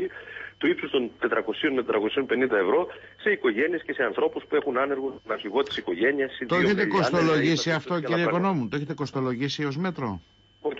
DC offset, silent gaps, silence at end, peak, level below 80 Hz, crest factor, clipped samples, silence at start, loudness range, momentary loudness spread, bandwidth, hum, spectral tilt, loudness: under 0.1%; none; 0 s; -12 dBFS; -62 dBFS; 14 dB; under 0.1%; 0 s; 2 LU; 9 LU; 7.8 kHz; none; -5.5 dB/octave; -26 LUFS